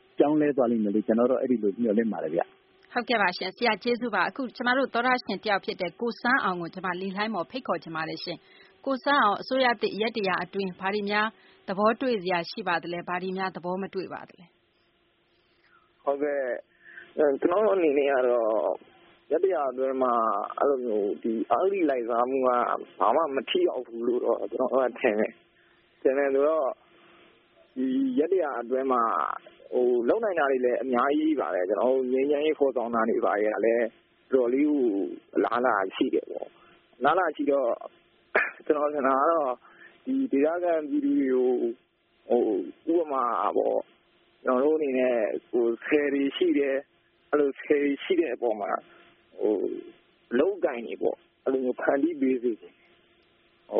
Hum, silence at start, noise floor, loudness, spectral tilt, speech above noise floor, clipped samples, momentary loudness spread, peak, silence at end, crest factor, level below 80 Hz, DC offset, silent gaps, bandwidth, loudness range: none; 0.2 s; -67 dBFS; -26 LUFS; -3 dB/octave; 42 dB; under 0.1%; 8 LU; -8 dBFS; 0 s; 18 dB; -74 dBFS; under 0.1%; none; 5.4 kHz; 4 LU